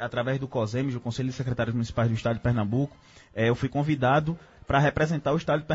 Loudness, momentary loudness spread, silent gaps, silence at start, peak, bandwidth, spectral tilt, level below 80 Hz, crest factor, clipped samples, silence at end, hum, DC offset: -27 LUFS; 7 LU; none; 0 s; -10 dBFS; 8 kHz; -7 dB/octave; -48 dBFS; 16 dB; under 0.1%; 0 s; none; under 0.1%